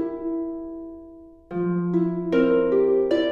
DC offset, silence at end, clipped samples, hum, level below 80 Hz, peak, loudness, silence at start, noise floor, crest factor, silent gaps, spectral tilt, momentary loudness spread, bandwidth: under 0.1%; 0 s; under 0.1%; none; -54 dBFS; -8 dBFS; -23 LUFS; 0 s; -45 dBFS; 14 dB; none; -9 dB/octave; 17 LU; 6.8 kHz